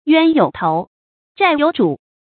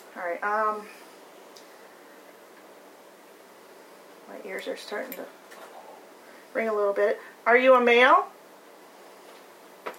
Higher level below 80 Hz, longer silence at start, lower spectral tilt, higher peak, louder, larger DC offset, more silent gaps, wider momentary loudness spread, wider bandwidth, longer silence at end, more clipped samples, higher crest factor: first, -56 dBFS vs under -90 dBFS; about the same, 0.05 s vs 0.15 s; first, -11 dB/octave vs -3 dB/octave; first, 0 dBFS vs -6 dBFS; first, -16 LUFS vs -23 LUFS; neither; first, 0.87-1.35 s vs none; second, 8 LU vs 27 LU; second, 4.6 kHz vs 16.5 kHz; first, 0.25 s vs 0.05 s; neither; second, 16 dB vs 22 dB